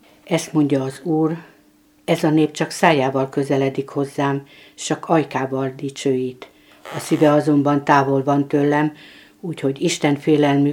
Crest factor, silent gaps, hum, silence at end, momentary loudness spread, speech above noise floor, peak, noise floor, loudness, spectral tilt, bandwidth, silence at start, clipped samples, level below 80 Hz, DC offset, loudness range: 20 dB; none; none; 0 s; 10 LU; 36 dB; 0 dBFS; -54 dBFS; -19 LUFS; -6 dB/octave; 16.5 kHz; 0.25 s; under 0.1%; -64 dBFS; under 0.1%; 4 LU